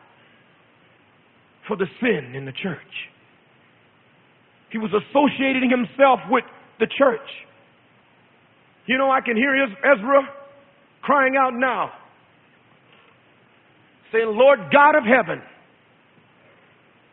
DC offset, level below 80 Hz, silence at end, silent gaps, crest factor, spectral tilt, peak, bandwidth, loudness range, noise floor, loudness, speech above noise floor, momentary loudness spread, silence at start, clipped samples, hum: under 0.1%; -68 dBFS; 1.7 s; none; 22 dB; -9.5 dB/octave; 0 dBFS; 4 kHz; 10 LU; -56 dBFS; -19 LUFS; 37 dB; 17 LU; 1.65 s; under 0.1%; none